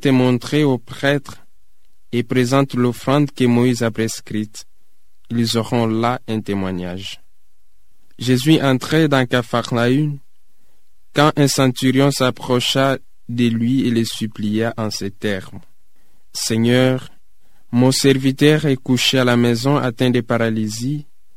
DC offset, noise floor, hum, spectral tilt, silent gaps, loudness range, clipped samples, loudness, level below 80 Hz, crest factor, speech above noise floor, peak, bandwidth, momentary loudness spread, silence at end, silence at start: 2%; -63 dBFS; none; -5.5 dB/octave; none; 6 LU; under 0.1%; -18 LUFS; -52 dBFS; 18 dB; 46 dB; 0 dBFS; 16 kHz; 11 LU; 0.35 s; 0.05 s